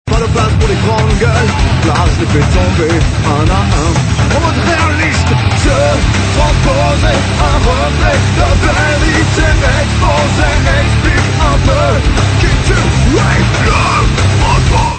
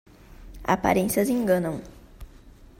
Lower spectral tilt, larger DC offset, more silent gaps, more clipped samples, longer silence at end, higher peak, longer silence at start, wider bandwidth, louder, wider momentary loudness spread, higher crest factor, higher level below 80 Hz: about the same, -5.5 dB/octave vs -5.5 dB/octave; neither; neither; neither; second, 0 s vs 0.3 s; first, 0 dBFS vs -6 dBFS; second, 0.05 s vs 0.3 s; second, 9.2 kHz vs 16 kHz; first, -10 LUFS vs -24 LUFS; second, 1 LU vs 12 LU; second, 10 dB vs 20 dB; first, -16 dBFS vs -46 dBFS